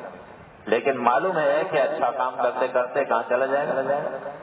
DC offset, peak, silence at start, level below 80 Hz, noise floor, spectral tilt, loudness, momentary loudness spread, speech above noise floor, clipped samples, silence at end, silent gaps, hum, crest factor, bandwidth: under 0.1%; -4 dBFS; 0 s; -68 dBFS; -45 dBFS; -9 dB/octave; -23 LUFS; 6 LU; 22 dB; under 0.1%; 0 s; none; none; 18 dB; 4 kHz